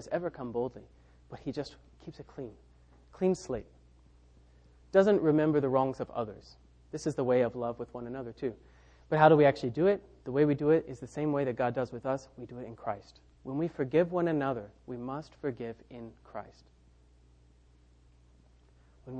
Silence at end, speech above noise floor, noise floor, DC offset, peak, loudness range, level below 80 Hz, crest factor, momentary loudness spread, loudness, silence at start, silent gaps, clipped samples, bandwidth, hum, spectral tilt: 0 s; 31 dB; -61 dBFS; under 0.1%; -8 dBFS; 12 LU; -60 dBFS; 24 dB; 20 LU; -31 LUFS; 0 s; none; under 0.1%; 9.4 kHz; none; -7.5 dB/octave